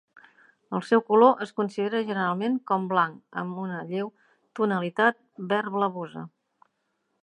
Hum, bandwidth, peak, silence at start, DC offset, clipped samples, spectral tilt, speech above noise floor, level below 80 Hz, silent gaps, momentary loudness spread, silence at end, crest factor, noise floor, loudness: none; 10.5 kHz; -4 dBFS; 0.7 s; under 0.1%; under 0.1%; -7 dB/octave; 50 dB; -80 dBFS; none; 16 LU; 0.95 s; 22 dB; -76 dBFS; -26 LUFS